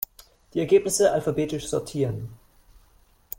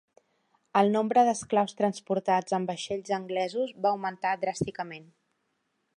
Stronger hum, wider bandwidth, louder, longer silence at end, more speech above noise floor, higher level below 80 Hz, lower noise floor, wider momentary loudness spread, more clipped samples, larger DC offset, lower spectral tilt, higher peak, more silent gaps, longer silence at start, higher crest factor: neither; first, 16.5 kHz vs 11 kHz; first, -24 LUFS vs -28 LUFS; about the same, 1.05 s vs 0.95 s; second, 35 dB vs 49 dB; first, -54 dBFS vs -68 dBFS; second, -58 dBFS vs -77 dBFS; first, 14 LU vs 10 LU; neither; neither; about the same, -5 dB/octave vs -5 dB/octave; about the same, -8 dBFS vs -8 dBFS; neither; second, 0.55 s vs 0.75 s; about the same, 18 dB vs 20 dB